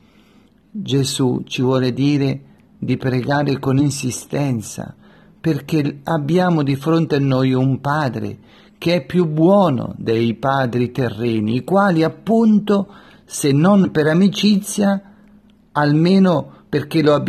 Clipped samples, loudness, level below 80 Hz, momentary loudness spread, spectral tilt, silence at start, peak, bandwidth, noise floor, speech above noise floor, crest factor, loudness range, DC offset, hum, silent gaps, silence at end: under 0.1%; -17 LUFS; -54 dBFS; 10 LU; -6.5 dB/octave; 0.75 s; -2 dBFS; 13.5 kHz; -52 dBFS; 35 dB; 14 dB; 4 LU; under 0.1%; none; none; 0 s